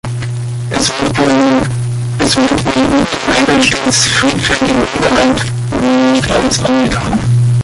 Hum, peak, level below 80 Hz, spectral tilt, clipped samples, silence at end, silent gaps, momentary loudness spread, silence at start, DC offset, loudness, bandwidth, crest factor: none; 0 dBFS; -32 dBFS; -4.5 dB/octave; under 0.1%; 0 s; none; 7 LU; 0.05 s; under 0.1%; -11 LUFS; 11.5 kHz; 12 dB